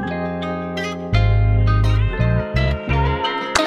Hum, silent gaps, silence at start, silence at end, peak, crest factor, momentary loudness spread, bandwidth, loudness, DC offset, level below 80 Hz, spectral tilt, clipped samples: none; none; 0 s; 0 s; -2 dBFS; 16 dB; 8 LU; 11 kHz; -19 LUFS; under 0.1%; -24 dBFS; -6 dB/octave; under 0.1%